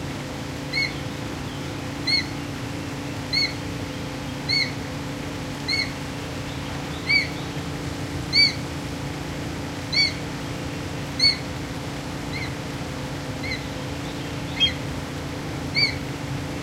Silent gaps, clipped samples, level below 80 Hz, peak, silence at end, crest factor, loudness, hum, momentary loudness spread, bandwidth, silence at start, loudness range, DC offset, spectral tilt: none; under 0.1%; -44 dBFS; -6 dBFS; 0 s; 20 dB; -25 LUFS; none; 11 LU; 16 kHz; 0 s; 4 LU; under 0.1%; -4 dB/octave